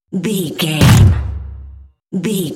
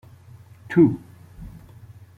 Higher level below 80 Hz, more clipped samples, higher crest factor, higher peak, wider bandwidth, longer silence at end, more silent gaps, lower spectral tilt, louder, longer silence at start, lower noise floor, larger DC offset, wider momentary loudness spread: first, -26 dBFS vs -50 dBFS; neither; second, 14 dB vs 20 dB; first, 0 dBFS vs -4 dBFS; first, 17 kHz vs 4.6 kHz; second, 0 s vs 0.7 s; neither; second, -5.5 dB/octave vs -9.5 dB/octave; first, -13 LUFS vs -19 LUFS; second, 0.1 s vs 0.7 s; second, -37 dBFS vs -47 dBFS; neither; second, 18 LU vs 25 LU